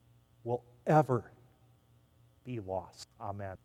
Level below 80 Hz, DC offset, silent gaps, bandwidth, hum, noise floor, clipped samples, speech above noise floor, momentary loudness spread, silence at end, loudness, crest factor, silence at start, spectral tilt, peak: -70 dBFS; under 0.1%; none; 13 kHz; none; -66 dBFS; under 0.1%; 32 dB; 18 LU; 0.1 s; -34 LUFS; 24 dB; 0.45 s; -8 dB/octave; -12 dBFS